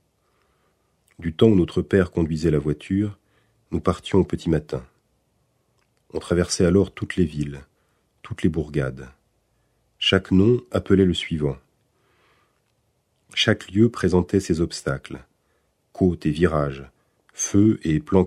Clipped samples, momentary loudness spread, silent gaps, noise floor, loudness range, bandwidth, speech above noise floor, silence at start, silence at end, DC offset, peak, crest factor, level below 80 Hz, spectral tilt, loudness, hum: under 0.1%; 14 LU; none; -69 dBFS; 4 LU; 12.5 kHz; 48 dB; 1.2 s; 0 s; under 0.1%; -2 dBFS; 22 dB; -44 dBFS; -6 dB/octave; -22 LUFS; none